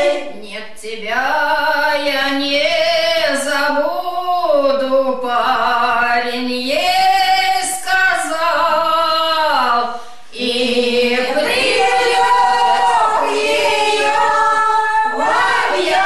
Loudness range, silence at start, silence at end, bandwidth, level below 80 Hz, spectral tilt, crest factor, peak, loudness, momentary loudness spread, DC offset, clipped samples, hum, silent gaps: 2 LU; 0 s; 0 s; 14.5 kHz; -52 dBFS; -1.5 dB/octave; 10 dB; -4 dBFS; -15 LUFS; 6 LU; 3%; under 0.1%; none; none